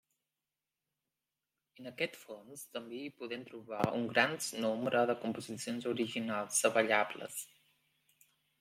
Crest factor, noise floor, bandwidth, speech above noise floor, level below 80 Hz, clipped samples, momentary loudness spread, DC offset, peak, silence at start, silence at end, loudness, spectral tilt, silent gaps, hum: 24 dB; under -90 dBFS; 16.5 kHz; over 54 dB; -80 dBFS; under 0.1%; 16 LU; under 0.1%; -14 dBFS; 1.8 s; 1.15 s; -35 LUFS; -3 dB/octave; none; none